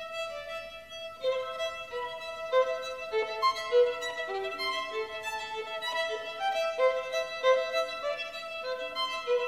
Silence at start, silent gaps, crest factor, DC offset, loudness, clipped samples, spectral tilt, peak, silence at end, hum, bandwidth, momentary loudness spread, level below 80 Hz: 0 s; none; 18 dB; under 0.1%; -31 LUFS; under 0.1%; -1 dB/octave; -12 dBFS; 0 s; none; 15 kHz; 10 LU; -68 dBFS